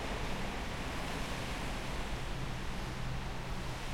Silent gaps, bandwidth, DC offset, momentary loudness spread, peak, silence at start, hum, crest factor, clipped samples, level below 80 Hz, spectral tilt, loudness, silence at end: none; 16.5 kHz; under 0.1%; 2 LU; -26 dBFS; 0 s; none; 12 dB; under 0.1%; -42 dBFS; -4.5 dB/octave; -40 LUFS; 0 s